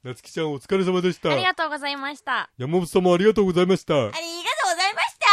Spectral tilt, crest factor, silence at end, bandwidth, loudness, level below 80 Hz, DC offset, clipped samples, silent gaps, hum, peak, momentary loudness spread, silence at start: -4.5 dB/octave; 20 dB; 0 s; 14 kHz; -22 LUFS; -56 dBFS; under 0.1%; under 0.1%; none; none; -2 dBFS; 9 LU; 0.05 s